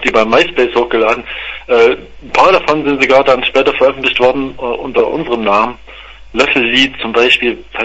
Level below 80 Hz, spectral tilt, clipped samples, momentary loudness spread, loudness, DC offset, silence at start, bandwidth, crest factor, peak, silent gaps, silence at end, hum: -40 dBFS; -4 dB/octave; 0.1%; 9 LU; -11 LUFS; under 0.1%; 0 s; 9.2 kHz; 12 dB; 0 dBFS; none; 0 s; none